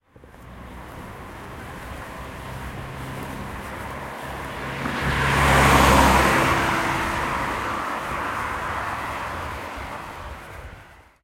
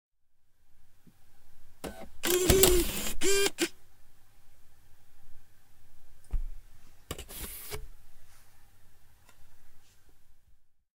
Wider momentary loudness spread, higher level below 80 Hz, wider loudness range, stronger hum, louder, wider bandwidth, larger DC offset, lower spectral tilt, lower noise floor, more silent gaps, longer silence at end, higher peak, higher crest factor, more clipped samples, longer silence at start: about the same, 22 LU vs 22 LU; first, -34 dBFS vs -42 dBFS; second, 16 LU vs 21 LU; neither; first, -22 LUFS vs -28 LUFS; about the same, 16.5 kHz vs 17.5 kHz; neither; first, -4.5 dB/octave vs -3 dB/octave; second, -46 dBFS vs -59 dBFS; neither; about the same, 0.2 s vs 0.3 s; about the same, -2 dBFS vs -2 dBFS; second, 22 dB vs 30 dB; neither; second, 0.2 s vs 0.4 s